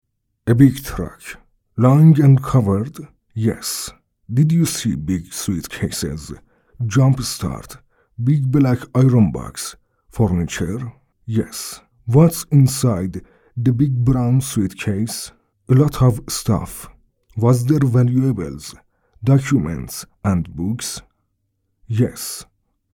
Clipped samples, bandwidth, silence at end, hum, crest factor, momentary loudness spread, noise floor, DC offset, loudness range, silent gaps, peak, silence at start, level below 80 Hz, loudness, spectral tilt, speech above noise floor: under 0.1%; 18 kHz; 0.5 s; none; 18 dB; 18 LU; -70 dBFS; under 0.1%; 5 LU; none; 0 dBFS; 0.45 s; -42 dBFS; -18 LUFS; -6.5 dB/octave; 53 dB